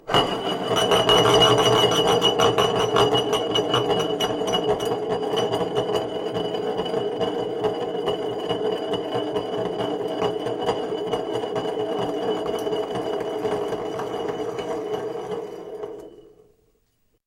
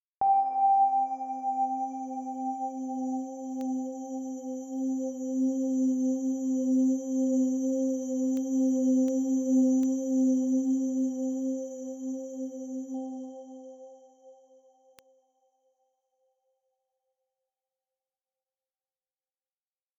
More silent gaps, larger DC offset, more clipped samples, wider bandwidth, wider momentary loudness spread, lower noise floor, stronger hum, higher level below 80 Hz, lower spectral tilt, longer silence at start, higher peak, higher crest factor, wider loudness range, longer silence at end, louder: neither; neither; neither; first, 16.5 kHz vs 7.8 kHz; about the same, 11 LU vs 12 LU; second, -67 dBFS vs under -90 dBFS; neither; first, -52 dBFS vs -84 dBFS; second, -4 dB/octave vs -6 dB/octave; second, 0.05 s vs 0.2 s; first, -6 dBFS vs -16 dBFS; about the same, 18 dB vs 14 dB; second, 10 LU vs 13 LU; second, 1.05 s vs 5.65 s; first, -23 LUFS vs -29 LUFS